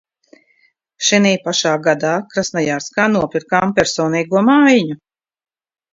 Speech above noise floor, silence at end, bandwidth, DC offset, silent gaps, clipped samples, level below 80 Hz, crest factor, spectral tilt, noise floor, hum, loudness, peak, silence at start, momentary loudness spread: 44 dB; 0.95 s; 7.8 kHz; under 0.1%; none; under 0.1%; -54 dBFS; 16 dB; -4 dB/octave; -59 dBFS; none; -15 LUFS; 0 dBFS; 1 s; 8 LU